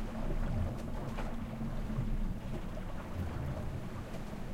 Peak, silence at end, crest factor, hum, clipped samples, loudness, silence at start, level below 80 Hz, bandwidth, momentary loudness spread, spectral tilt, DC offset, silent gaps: -24 dBFS; 0 s; 12 dB; none; under 0.1%; -41 LUFS; 0 s; -40 dBFS; 15.5 kHz; 6 LU; -7.5 dB/octave; under 0.1%; none